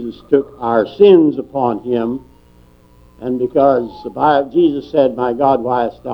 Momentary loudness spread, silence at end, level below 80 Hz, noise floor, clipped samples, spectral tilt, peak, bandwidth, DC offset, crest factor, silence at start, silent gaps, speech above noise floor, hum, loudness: 10 LU; 0 s; -50 dBFS; -47 dBFS; under 0.1%; -9 dB/octave; 0 dBFS; 5.6 kHz; under 0.1%; 14 dB; 0 s; none; 32 dB; 60 Hz at -50 dBFS; -15 LUFS